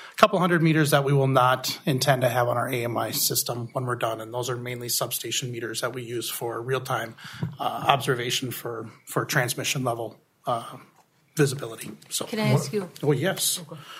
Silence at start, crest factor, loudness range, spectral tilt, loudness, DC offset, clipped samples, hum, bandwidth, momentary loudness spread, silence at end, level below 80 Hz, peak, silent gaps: 0 s; 26 dB; 6 LU; -4 dB/octave; -25 LUFS; under 0.1%; under 0.1%; none; 16 kHz; 12 LU; 0 s; -66 dBFS; 0 dBFS; none